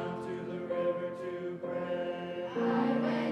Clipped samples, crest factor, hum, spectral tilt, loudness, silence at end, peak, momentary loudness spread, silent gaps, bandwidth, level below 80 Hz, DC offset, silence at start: under 0.1%; 14 dB; none; -7.5 dB/octave; -34 LUFS; 0 s; -20 dBFS; 9 LU; none; 9.2 kHz; -76 dBFS; under 0.1%; 0 s